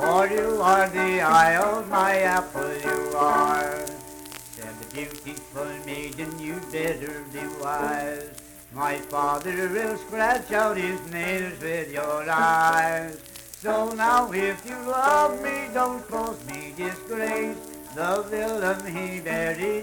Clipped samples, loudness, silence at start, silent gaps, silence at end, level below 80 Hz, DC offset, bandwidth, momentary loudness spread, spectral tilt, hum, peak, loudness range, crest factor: under 0.1%; -25 LUFS; 0 s; none; 0 s; -54 dBFS; under 0.1%; 19 kHz; 16 LU; -4 dB/octave; none; -8 dBFS; 9 LU; 18 dB